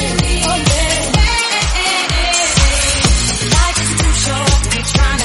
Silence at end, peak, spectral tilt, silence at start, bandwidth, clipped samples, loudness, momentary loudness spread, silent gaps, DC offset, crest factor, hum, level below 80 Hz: 0 s; 0 dBFS; -3 dB/octave; 0 s; 11.5 kHz; under 0.1%; -13 LUFS; 2 LU; none; under 0.1%; 14 dB; none; -18 dBFS